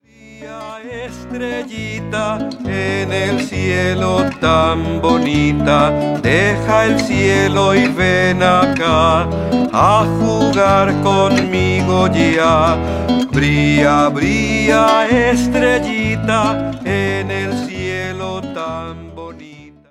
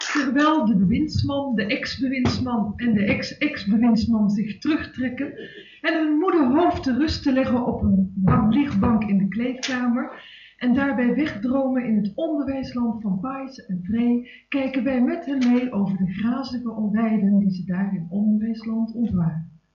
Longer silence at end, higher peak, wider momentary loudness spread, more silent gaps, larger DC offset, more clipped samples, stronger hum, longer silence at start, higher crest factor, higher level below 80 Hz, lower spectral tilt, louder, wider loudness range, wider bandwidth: about the same, 0.2 s vs 0.25 s; first, 0 dBFS vs -8 dBFS; first, 12 LU vs 8 LU; neither; neither; neither; neither; first, 0.25 s vs 0 s; about the same, 14 dB vs 14 dB; first, -34 dBFS vs -46 dBFS; second, -5.5 dB/octave vs -7 dB/octave; first, -14 LUFS vs -22 LUFS; first, 7 LU vs 4 LU; first, 14 kHz vs 7.4 kHz